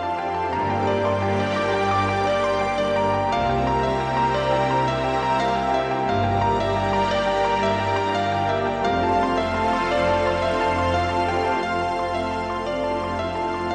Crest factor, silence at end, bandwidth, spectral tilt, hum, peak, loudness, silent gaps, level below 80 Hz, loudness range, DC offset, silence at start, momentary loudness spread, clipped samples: 14 dB; 0 s; 11 kHz; -6 dB/octave; none; -8 dBFS; -22 LUFS; none; -42 dBFS; 1 LU; under 0.1%; 0 s; 4 LU; under 0.1%